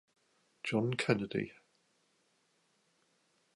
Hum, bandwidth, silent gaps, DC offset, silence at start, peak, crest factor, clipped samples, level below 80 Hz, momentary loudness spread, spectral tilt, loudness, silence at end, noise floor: none; 11.5 kHz; none; under 0.1%; 0.65 s; -14 dBFS; 26 dB; under 0.1%; -74 dBFS; 10 LU; -6 dB/octave; -35 LUFS; 2.05 s; -75 dBFS